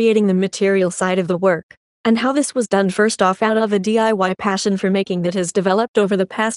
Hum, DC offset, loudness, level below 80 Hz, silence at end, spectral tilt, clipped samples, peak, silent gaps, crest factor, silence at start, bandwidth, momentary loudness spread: none; under 0.1%; -17 LUFS; -62 dBFS; 0 s; -5 dB/octave; under 0.1%; 0 dBFS; 1.63-1.69 s, 1.77-2.04 s, 5.88-5.94 s; 16 dB; 0 s; 11.5 kHz; 3 LU